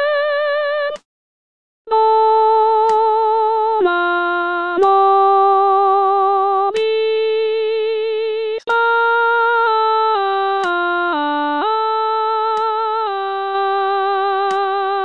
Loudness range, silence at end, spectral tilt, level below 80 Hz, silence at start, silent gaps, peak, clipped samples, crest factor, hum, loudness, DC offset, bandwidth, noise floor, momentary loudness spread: 4 LU; 0 s; -3 dB/octave; -70 dBFS; 0 s; 1.05-1.85 s; -4 dBFS; under 0.1%; 12 dB; none; -16 LUFS; 0.4%; 8.6 kHz; under -90 dBFS; 6 LU